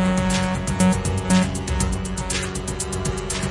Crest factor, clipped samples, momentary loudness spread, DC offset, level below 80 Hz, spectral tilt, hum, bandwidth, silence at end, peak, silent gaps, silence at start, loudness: 16 dB; under 0.1%; 7 LU; under 0.1%; -32 dBFS; -5 dB/octave; none; 11.5 kHz; 0 s; -4 dBFS; none; 0 s; -22 LUFS